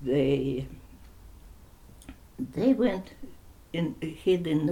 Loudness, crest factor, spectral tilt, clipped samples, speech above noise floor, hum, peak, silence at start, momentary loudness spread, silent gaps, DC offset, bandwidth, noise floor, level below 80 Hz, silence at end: -28 LUFS; 18 dB; -7.5 dB/octave; under 0.1%; 24 dB; none; -12 dBFS; 0 s; 25 LU; none; under 0.1%; 17 kHz; -51 dBFS; -50 dBFS; 0 s